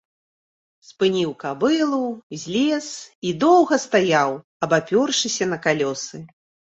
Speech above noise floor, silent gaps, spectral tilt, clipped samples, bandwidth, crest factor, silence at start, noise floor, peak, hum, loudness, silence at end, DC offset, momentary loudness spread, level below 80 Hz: over 69 dB; 2.23-2.30 s, 3.15-3.22 s, 4.44-4.60 s; -4 dB/octave; under 0.1%; 8.2 kHz; 18 dB; 0.9 s; under -90 dBFS; -4 dBFS; none; -20 LUFS; 0.5 s; under 0.1%; 12 LU; -66 dBFS